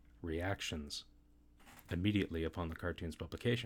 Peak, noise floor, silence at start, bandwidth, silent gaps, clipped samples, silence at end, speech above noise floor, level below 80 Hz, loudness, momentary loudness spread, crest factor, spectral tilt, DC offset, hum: -22 dBFS; -65 dBFS; 0.15 s; 17.5 kHz; none; under 0.1%; 0 s; 26 dB; -54 dBFS; -40 LUFS; 11 LU; 18 dB; -5.5 dB/octave; under 0.1%; none